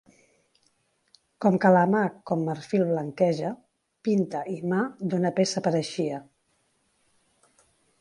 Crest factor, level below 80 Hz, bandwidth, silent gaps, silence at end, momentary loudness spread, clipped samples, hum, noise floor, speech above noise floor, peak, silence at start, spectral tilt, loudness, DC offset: 20 dB; -72 dBFS; 11 kHz; none; 1.8 s; 11 LU; under 0.1%; none; -71 dBFS; 46 dB; -6 dBFS; 1.4 s; -6.5 dB/octave; -26 LUFS; under 0.1%